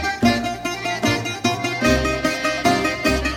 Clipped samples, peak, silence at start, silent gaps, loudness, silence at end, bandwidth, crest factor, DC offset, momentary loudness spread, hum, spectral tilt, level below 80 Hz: under 0.1%; -2 dBFS; 0 s; none; -20 LUFS; 0 s; 17 kHz; 18 dB; under 0.1%; 4 LU; none; -4 dB/octave; -34 dBFS